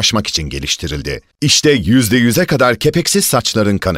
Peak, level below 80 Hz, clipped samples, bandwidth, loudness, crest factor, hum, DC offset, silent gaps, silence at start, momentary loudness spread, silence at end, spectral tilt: 0 dBFS; -36 dBFS; under 0.1%; 16 kHz; -13 LUFS; 12 dB; none; under 0.1%; none; 0 s; 8 LU; 0 s; -4 dB/octave